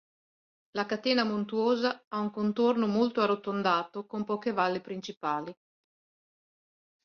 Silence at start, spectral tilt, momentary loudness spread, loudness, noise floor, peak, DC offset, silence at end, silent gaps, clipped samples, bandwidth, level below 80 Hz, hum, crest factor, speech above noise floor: 0.75 s; -6 dB/octave; 9 LU; -30 LUFS; under -90 dBFS; -12 dBFS; under 0.1%; 1.5 s; 2.07-2.11 s, 5.17-5.21 s; under 0.1%; 6.8 kHz; -76 dBFS; none; 18 dB; over 61 dB